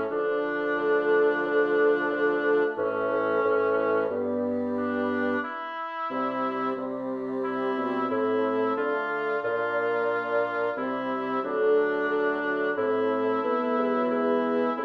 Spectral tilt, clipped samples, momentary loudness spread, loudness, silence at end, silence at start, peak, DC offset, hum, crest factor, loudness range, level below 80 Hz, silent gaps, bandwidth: -7 dB/octave; under 0.1%; 6 LU; -26 LUFS; 0 s; 0 s; -12 dBFS; under 0.1%; none; 14 dB; 4 LU; -74 dBFS; none; 5.6 kHz